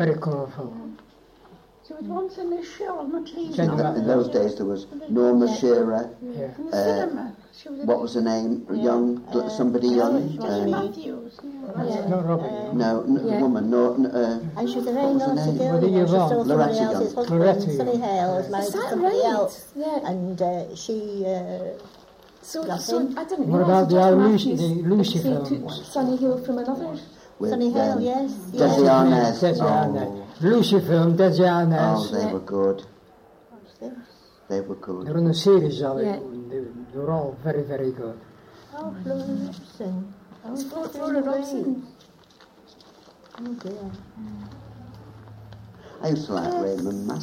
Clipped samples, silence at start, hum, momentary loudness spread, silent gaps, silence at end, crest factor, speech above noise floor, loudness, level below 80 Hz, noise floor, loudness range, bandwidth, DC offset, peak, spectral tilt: under 0.1%; 0 s; none; 17 LU; none; 0 s; 18 dB; 30 dB; -23 LUFS; -62 dBFS; -53 dBFS; 10 LU; 16 kHz; under 0.1%; -6 dBFS; -7 dB/octave